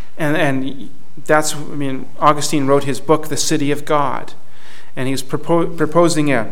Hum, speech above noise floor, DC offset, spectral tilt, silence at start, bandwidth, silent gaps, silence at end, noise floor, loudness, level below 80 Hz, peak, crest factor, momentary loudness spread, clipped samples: none; 27 dB; 10%; -4.5 dB/octave; 0.15 s; 17 kHz; none; 0 s; -44 dBFS; -17 LUFS; -56 dBFS; 0 dBFS; 18 dB; 12 LU; under 0.1%